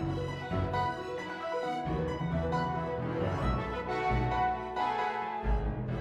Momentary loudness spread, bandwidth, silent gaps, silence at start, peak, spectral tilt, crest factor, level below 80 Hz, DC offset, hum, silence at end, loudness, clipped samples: 5 LU; 10.5 kHz; none; 0 s; -18 dBFS; -7.5 dB/octave; 14 dB; -40 dBFS; under 0.1%; none; 0 s; -33 LUFS; under 0.1%